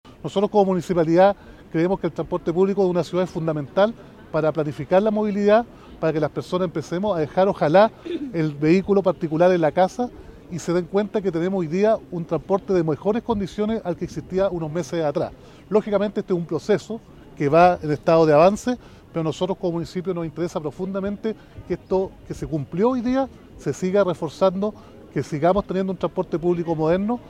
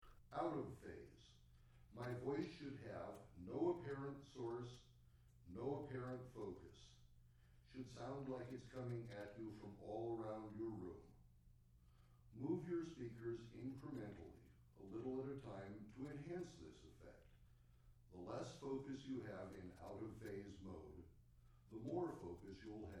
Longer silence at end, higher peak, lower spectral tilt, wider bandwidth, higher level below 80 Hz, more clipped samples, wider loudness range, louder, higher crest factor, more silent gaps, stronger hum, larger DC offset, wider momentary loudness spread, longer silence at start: about the same, 0 s vs 0 s; first, -2 dBFS vs -30 dBFS; about the same, -7 dB/octave vs -7.5 dB/octave; about the same, 12.5 kHz vs 13 kHz; first, -50 dBFS vs -70 dBFS; neither; about the same, 5 LU vs 5 LU; first, -22 LUFS vs -51 LUFS; about the same, 18 dB vs 20 dB; neither; neither; neither; second, 12 LU vs 17 LU; first, 0.25 s vs 0 s